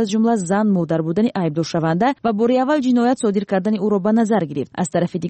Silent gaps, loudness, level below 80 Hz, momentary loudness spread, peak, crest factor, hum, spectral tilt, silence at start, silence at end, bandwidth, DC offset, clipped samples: none; -18 LUFS; -60 dBFS; 4 LU; -8 dBFS; 10 dB; none; -6.5 dB/octave; 0 s; 0 s; 8.8 kHz; under 0.1%; under 0.1%